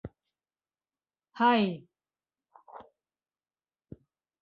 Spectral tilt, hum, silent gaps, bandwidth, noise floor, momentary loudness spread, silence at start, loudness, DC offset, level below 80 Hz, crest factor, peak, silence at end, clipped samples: -8 dB/octave; none; none; 5.6 kHz; under -90 dBFS; 27 LU; 0.05 s; -27 LUFS; under 0.1%; -66 dBFS; 24 dB; -12 dBFS; 1.6 s; under 0.1%